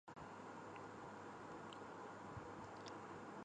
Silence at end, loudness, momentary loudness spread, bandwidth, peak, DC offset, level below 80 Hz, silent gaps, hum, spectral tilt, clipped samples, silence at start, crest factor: 0 s; -54 LUFS; 1 LU; 9.6 kHz; -38 dBFS; under 0.1%; -76 dBFS; none; none; -5.5 dB/octave; under 0.1%; 0.05 s; 16 dB